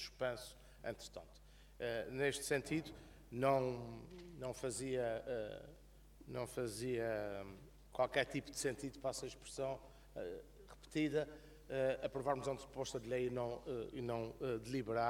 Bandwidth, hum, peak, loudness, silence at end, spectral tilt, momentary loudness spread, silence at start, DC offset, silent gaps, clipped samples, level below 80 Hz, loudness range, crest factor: 18 kHz; none; -20 dBFS; -42 LUFS; 0 s; -4.5 dB/octave; 16 LU; 0 s; under 0.1%; none; under 0.1%; -64 dBFS; 3 LU; 22 dB